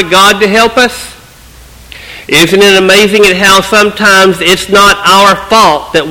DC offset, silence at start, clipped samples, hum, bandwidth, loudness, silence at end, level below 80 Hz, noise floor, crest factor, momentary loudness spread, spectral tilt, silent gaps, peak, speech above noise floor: 0.2%; 0 s; 5%; none; over 20 kHz; -5 LUFS; 0 s; -34 dBFS; -34 dBFS; 6 dB; 7 LU; -3 dB/octave; none; 0 dBFS; 28 dB